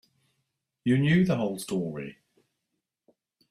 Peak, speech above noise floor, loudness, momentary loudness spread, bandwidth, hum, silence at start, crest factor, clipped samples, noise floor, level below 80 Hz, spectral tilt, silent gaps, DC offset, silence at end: -12 dBFS; 58 dB; -26 LUFS; 15 LU; 14.5 kHz; none; 0.85 s; 18 dB; under 0.1%; -83 dBFS; -62 dBFS; -7 dB/octave; none; under 0.1%; 1.4 s